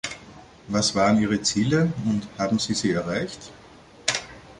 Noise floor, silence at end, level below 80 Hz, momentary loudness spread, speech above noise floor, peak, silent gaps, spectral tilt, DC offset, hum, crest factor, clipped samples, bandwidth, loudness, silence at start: -46 dBFS; 0.05 s; -52 dBFS; 14 LU; 24 dB; -4 dBFS; none; -4.5 dB/octave; under 0.1%; none; 20 dB; under 0.1%; 11.5 kHz; -24 LUFS; 0.05 s